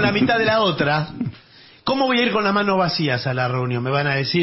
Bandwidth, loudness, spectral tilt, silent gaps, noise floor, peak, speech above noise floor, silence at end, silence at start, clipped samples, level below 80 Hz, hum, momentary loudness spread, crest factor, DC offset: 6 kHz; -19 LUFS; -8.5 dB/octave; none; -48 dBFS; -6 dBFS; 29 dB; 0 s; 0 s; under 0.1%; -52 dBFS; none; 8 LU; 14 dB; under 0.1%